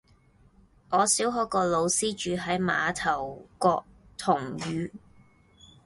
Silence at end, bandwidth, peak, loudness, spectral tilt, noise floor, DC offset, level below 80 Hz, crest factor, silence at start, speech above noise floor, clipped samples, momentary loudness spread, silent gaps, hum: 0.9 s; 12 kHz; -8 dBFS; -27 LUFS; -3.5 dB/octave; -60 dBFS; under 0.1%; -58 dBFS; 20 dB; 0.9 s; 33 dB; under 0.1%; 10 LU; none; none